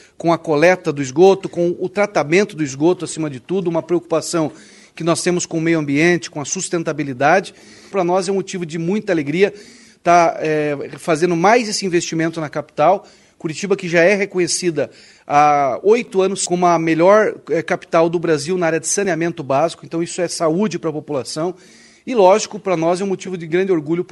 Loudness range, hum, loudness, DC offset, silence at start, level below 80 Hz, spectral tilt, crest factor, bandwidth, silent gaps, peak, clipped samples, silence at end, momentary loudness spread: 4 LU; none; -17 LUFS; under 0.1%; 0.25 s; -62 dBFS; -4.5 dB/octave; 18 dB; 12 kHz; none; 0 dBFS; under 0.1%; 0.05 s; 10 LU